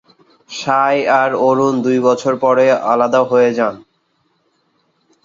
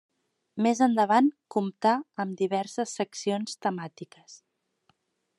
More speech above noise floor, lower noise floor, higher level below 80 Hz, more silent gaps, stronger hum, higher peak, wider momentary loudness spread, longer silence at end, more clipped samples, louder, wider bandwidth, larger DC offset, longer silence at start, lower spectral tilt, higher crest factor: first, 49 dB vs 44 dB; second, -63 dBFS vs -71 dBFS; first, -64 dBFS vs -86 dBFS; neither; neither; first, -2 dBFS vs -8 dBFS; second, 6 LU vs 16 LU; first, 1.45 s vs 1.05 s; neither; first, -14 LUFS vs -27 LUFS; second, 7.6 kHz vs 11.5 kHz; neither; about the same, 0.5 s vs 0.55 s; about the same, -5.5 dB/octave vs -5 dB/octave; second, 14 dB vs 20 dB